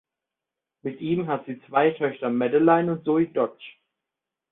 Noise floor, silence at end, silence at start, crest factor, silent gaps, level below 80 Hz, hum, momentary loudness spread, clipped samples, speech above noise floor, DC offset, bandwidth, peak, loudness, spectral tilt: -87 dBFS; 0.8 s; 0.85 s; 18 dB; none; -68 dBFS; none; 11 LU; under 0.1%; 64 dB; under 0.1%; 4 kHz; -6 dBFS; -24 LUFS; -11.5 dB/octave